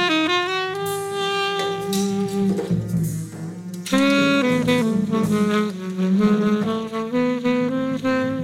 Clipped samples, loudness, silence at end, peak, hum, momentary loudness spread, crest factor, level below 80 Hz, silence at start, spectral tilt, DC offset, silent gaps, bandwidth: under 0.1%; -21 LUFS; 0 s; -6 dBFS; none; 8 LU; 14 dB; -54 dBFS; 0 s; -5.5 dB/octave; under 0.1%; none; 16.5 kHz